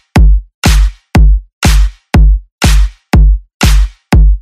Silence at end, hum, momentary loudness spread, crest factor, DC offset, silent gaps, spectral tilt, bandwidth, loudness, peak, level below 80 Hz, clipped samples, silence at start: 0 s; none; 3 LU; 8 dB; under 0.1%; 0.54-0.62 s, 1.53-1.61 s, 2.52-2.59 s, 3.54-3.60 s; -5 dB/octave; 14.5 kHz; -11 LUFS; 0 dBFS; -8 dBFS; under 0.1%; 0.15 s